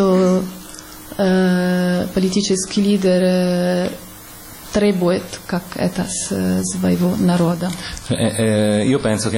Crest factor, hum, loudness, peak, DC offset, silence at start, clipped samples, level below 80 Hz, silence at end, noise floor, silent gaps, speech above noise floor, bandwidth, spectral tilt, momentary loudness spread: 10 dB; none; -18 LUFS; -6 dBFS; under 0.1%; 0 s; under 0.1%; -44 dBFS; 0 s; -37 dBFS; none; 20 dB; 16.5 kHz; -5.5 dB/octave; 14 LU